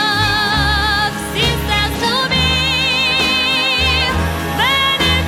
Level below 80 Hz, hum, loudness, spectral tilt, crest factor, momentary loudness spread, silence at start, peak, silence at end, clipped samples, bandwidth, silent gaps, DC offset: -26 dBFS; none; -14 LUFS; -3.5 dB/octave; 14 dB; 4 LU; 0 s; -2 dBFS; 0 s; under 0.1%; 18 kHz; none; under 0.1%